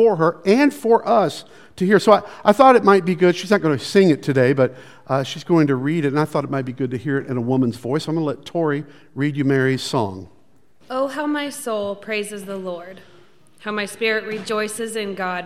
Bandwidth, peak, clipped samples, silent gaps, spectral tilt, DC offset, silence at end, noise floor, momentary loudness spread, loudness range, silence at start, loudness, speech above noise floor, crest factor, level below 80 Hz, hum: 15.5 kHz; 0 dBFS; under 0.1%; none; -6 dB/octave; 0.3%; 0 s; -57 dBFS; 11 LU; 10 LU; 0 s; -19 LUFS; 39 dB; 20 dB; -64 dBFS; none